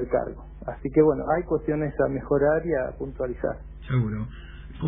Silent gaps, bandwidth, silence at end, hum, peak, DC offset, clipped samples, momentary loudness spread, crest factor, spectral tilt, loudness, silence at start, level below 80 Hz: none; 3.8 kHz; 0 s; none; -6 dBFS; under 0.1%; under 0.1%; 16 LU; 18 dB; -12.5 dB/octave; -25 LUFS; 0 s; -42 dBFS